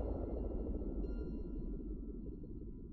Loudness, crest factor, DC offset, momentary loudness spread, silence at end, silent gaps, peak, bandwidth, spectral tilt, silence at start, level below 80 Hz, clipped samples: -45 LUFS; 14 dB; under 0.1%; 7 LU; 0 s; none; -28 dBFS; 4.4 kHz; -12 dB/octave; 0 s; -44 dBFS; under 0.1%